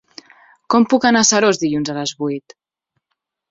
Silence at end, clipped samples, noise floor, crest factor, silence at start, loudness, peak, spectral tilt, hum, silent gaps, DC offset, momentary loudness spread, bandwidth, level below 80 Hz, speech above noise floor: 1.1 s; under 0.1%; -76 dBFS; 18 dB; 0.7 s; -16 LUFS; -2 dBFS; -3 dB/octave; none; none; under 0.1%; 12 LU; 7.8 kHz; -60 dBFS; 60 dB